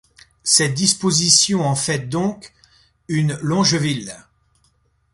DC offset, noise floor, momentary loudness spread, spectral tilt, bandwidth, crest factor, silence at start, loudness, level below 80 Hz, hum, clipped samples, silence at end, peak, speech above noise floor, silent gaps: under 0.1%; -62 dBFS; 13 LU; -3 dB/octave; 11.5 kHz; 20 dB; 0.45 s; -17 LUFS; -54 dBFS; none; under 0.1%; 0.95 s; 0 dBFS; 44 dB; none